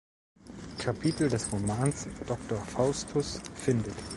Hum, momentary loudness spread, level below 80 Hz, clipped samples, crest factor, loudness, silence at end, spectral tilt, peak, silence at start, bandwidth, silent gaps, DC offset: none; 9 LU; -52 dBFS; under 0.1%; 20 dB; -31 LUFS; 0 s; -5.5 dB/octave; -12 dBFS; 0.4 s; 11.5 kHz; none; under 0.1%